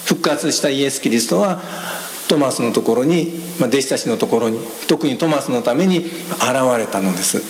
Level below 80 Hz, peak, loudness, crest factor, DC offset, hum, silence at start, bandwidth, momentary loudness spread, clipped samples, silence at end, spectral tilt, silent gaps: -66 dBFS; 0 dBFS; -18 LUFS; 16 dB; under 0.1%; none; 0 s; 17 kHz; 7 LU; under 0.1%; 0 s; -4 dB/octave; none